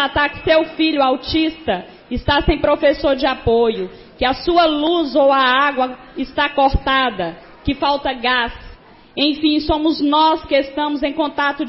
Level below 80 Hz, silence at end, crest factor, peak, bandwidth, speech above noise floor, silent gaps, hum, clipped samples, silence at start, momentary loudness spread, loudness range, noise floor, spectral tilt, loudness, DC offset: -34 dBFS; 0 s; 14 dB; -4 dBFS; 5.8 kHz; 24 dB; none; none; under 0.1%; 0 s; 10 LU; 3 LU; -40 dBFS; -9 dB/octave; -17 LUFS; under 0.1%